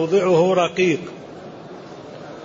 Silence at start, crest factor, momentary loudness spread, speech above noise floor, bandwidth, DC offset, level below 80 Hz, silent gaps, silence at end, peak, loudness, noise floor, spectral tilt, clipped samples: 0 s; 14 dB; 21 LU; 19 dB; 7.6 kHz; under 0.1%; -62 dBFS; none; 0 s; -6 dBFS; -18 LUFS; -37 dBFS; -6 dB/octave; under 0.1%